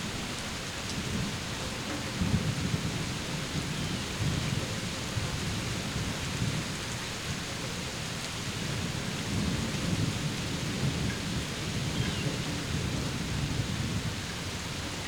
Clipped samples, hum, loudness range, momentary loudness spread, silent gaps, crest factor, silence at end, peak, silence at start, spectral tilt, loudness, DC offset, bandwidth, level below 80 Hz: under 0.1%; none; 2 LU; 4 LU; none; 18 dB; 0 s; -14 dBFS; 0 s; -4 dB/octave; -32 LUFS; under 0.1%; 19.5 kHz; -44 dBFS